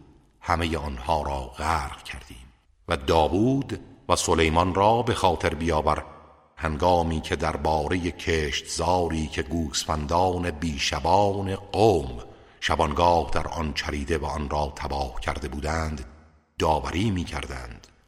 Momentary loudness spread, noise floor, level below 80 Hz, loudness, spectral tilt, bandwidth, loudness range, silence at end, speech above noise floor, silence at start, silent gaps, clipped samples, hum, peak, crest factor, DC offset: 12 LU; -47 dBFS; -38 dBFS; -25 LUFS; -5 dB/octave; 15.5 kHz; 5 LU; 0.3 s; 22 dB; 0.45 s; none; under 0.1%; none; -4 dBFS; 20 dB; under 0.1%